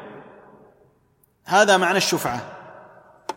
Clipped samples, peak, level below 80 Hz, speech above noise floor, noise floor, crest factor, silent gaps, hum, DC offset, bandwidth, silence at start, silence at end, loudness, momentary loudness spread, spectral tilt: under 0.1%; -2 dBFS; -64 dBFS; 44 dB; -62 dBFS; 22 dB; none; none; under 0.1%; 16.5 kHz; 0 s; 0.05 s; -19 LUFS; 24 LU; -3 dB/octave